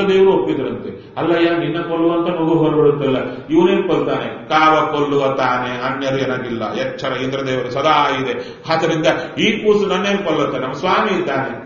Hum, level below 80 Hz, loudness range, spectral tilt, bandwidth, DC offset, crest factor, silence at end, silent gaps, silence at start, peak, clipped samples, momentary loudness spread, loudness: none; -50 dBFS; 3 LU; -4 dB/octave; 7 kHz; under 0.1%; 16 dB; 0 s; none; 0 s; 0 dBFS; under 0.1%; 8 LU; -17 LUFS